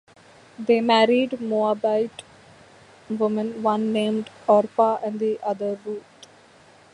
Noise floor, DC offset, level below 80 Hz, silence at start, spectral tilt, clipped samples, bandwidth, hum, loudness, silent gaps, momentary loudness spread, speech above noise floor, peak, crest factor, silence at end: -52 dBFS; under 0.1%; -70 dBFS; 0.6 s; -6 dB/octave; under 0.1%; 11 kHz; none; -22 LUFS; none; 14 LU; 30 dB; -4 dBFS; 20 dB; 0.95 s